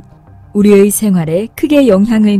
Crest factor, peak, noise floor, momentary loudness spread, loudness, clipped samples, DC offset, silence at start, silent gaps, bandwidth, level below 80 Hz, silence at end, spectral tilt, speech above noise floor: 10 dB; 0 dBFS; -38 dBFS; 8 LU; -10 LUFS; 0.5%; under 0.1%; 0.55 s; none; 15.5 kHz; -40 dBFS; 0 s; -6 dB/octave; 29 dB